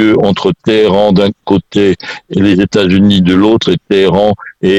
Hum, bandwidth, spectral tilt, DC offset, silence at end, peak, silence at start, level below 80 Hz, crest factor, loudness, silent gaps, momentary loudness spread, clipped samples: none; 8.8 kHz; -7 dB/octave; under 0.1%; 0 s; 0 dBFS; 0 s; -40 dBFS; 10 dB; -10 LUFS; none; 5 LU; under 0.1%